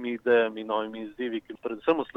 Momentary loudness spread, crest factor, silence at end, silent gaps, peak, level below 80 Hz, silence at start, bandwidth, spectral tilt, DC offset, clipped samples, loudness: 12 LU; 18 dB; 0.1 s; none; -10 dBFS; -68 dBFS; 0 s; 4.4 kHz; -6.5 dB/octave; under 0.1%; under 0.1%; -28 LUFS